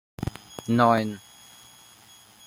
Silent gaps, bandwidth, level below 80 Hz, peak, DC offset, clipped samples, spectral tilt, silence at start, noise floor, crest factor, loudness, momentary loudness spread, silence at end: none; 16 kHz; -54 dBFS; -6 dBFS; under 0.1%; under 0.1%; -6.5 dB/octave; 0.2 s; -53 dBFS; 22 dB; -24 LUFS; 17 LU; 1.3 s